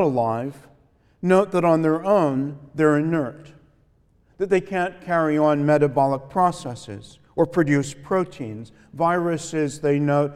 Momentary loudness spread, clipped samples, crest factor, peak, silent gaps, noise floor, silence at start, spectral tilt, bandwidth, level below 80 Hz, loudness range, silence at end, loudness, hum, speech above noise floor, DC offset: 15 LU; under 0.1%; 18 dB; -4 dBFS; none; -60 dBFS; 0 s; -7 dB/octave; 12.5 kHz; -58 dBFS; 3 LU; 0 s; -21 LUFS; none; 38 dB; under 0.1%